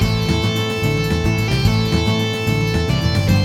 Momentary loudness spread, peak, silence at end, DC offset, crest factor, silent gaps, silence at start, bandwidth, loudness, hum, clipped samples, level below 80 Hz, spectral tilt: 2 LU; -4 dBFS; 0 s; under 0.1%; 14 dB; none; 0 s; 16.5 kHz; -18 LUFS; none; under 0.1%; -28 dBFS; -6 dB/octave